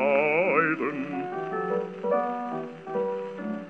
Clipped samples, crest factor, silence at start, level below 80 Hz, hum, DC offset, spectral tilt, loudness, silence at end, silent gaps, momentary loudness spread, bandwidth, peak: under 0.1%; 18 dB; 0 s; -86 dBFS; none; under 0.1%; -8 dB/octave; -27 LUFS; 0 s; none; 11 LU; 7.6 kHz; -10 dBFS